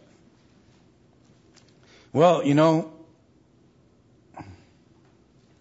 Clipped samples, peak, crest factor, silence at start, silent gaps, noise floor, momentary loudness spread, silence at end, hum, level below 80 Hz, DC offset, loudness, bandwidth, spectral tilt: under 0.1%; -6 dBFS; 22 dB; 2.15 s; none; -59 dBFS; 26 LU; 1.2 s; none; -68 dBFS; under 0.1%; -21 LUFS; 8 kHz; -7 dB/octave